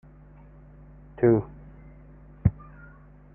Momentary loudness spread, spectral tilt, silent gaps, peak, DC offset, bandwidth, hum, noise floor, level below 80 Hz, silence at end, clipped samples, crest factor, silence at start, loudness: 27 LU; -14 dB/octave; none; -6 dBFS; under 0.1%; 2.8 kHz; 50 Hz at -45 dBFS; -50 dBFS; -46 dBFS; 0.85 s; under 0.1%; 24 dB; 1.2 s; -25 LUFS